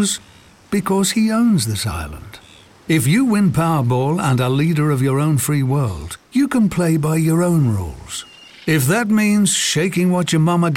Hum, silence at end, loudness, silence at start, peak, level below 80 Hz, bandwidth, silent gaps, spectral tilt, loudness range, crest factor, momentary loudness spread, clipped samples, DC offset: none; 0 s; -17 LUFS; 0 s; -4 dBFS; -44 dBFS; 17 kHz; none; -5.5 dB/octave; 2 LU; 14 dB; 11 LU; under 0.1%; under 0.1%